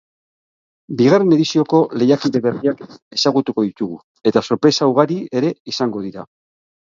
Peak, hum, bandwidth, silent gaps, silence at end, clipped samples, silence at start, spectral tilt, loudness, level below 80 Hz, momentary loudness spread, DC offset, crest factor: 0 dBFS; none; 7.6 kHz; 3.02-3.11 s, 4.04-4.15 s, 5.60-5.65 s; 0.6 s; under 0.1%; 0.9 s; -6 dB/octave; -17 LUFS; -62 dBFS; 13 LU; under 0.1%; 18 dB